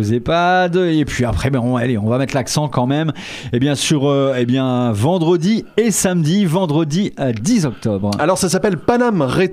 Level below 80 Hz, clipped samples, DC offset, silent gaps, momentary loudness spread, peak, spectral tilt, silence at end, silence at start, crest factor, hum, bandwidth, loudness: -40 dBFS; under 0.1%; under 0.1%; none; 4 LU; -2 dBFS; -5.5 dB/octave; 0 s; 0 s; 14 dB; none; 16 kHz; -16 LUFS